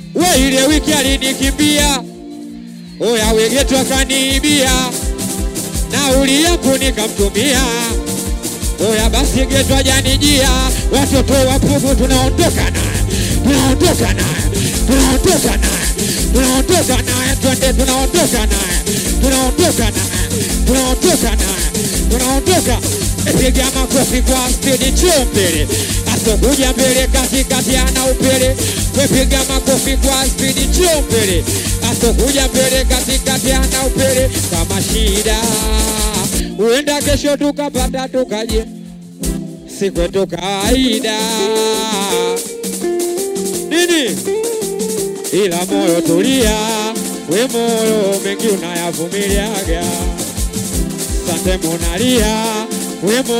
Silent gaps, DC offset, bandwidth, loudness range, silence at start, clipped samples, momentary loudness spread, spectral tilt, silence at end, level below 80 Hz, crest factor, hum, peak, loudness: none; under 0.1%; 16.5 kHz; 4 LU; 0 s; under 0.1%; 7 LU; -3.5 dB/octave; 0 s; -20 dBFS; 14 dB; none; 0 dBFS; -14 LUFS